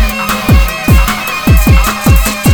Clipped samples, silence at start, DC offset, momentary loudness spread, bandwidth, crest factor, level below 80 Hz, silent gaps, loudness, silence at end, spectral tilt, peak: under 0.1%; 0 s; under 0.1%; 5 LU; over 20 kHz; 8 dB; -12 dBFS; none; -10 LUFS; 0 s; -5 dB/octave; 0 dBFS